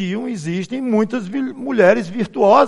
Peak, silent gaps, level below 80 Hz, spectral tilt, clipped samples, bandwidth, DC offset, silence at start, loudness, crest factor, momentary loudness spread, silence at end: 0 dBFS; none; -62 dBFS; -6.5 dB/octave; under 0.1%; 11 kHz; under 0.1%; 0 s; -18 LUFS; 16 dB; 10 LU; 0 s